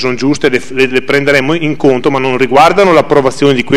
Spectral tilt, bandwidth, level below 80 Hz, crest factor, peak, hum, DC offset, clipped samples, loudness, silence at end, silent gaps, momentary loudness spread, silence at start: -5.5 dB/octave; 14 kHz; -40 dBFS; 10 dB; 0 dBFS; none; 7%; 2%; -9 LUFS; 0 s; none; 5 LU; 0 s